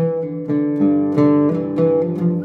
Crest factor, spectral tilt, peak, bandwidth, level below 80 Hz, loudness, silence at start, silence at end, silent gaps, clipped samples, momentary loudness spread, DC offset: 14 dB; -11 dB/octave; -4 dBFS; 4.4 kHz; -64 dBFS; -17 LUFS; 0 s; 0 s; none; under 0.1%; 6 LU; under 0.1%